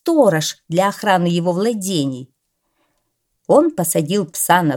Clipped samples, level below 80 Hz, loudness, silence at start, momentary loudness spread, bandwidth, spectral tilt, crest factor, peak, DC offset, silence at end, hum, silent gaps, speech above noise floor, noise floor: under 0.1%; -66 dBFS; -17 LUFS; 0.05 s; 7 LU; 18.5 kHz; -4.5 dB/octave; 18 dB; 0 dBFS; under 0.1%; 0 s; none; none; 54 dB; -70 dBFS